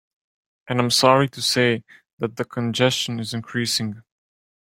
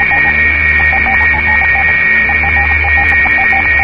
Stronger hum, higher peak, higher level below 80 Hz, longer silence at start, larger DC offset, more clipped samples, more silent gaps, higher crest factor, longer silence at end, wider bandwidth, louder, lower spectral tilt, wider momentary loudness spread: neither; about the same, -2 dBFS vs 0 dBFS; second, -62 dBFS vs -22 dBFS; first, 0.65 s vs 0 s; second, under 0.1% vs 0.4%; neither; first, 2.13-2.17 s vs none; first, 20 dB vs 10 dB; first, 0.7 s vs 0 s; first, 16.5 kHz vs 5.4 kHz; second, -21 LUFS vs -8 LUFS; second, -4 dB/octave vs -6.5 dB/octave; first, 13 LU vs 1 LU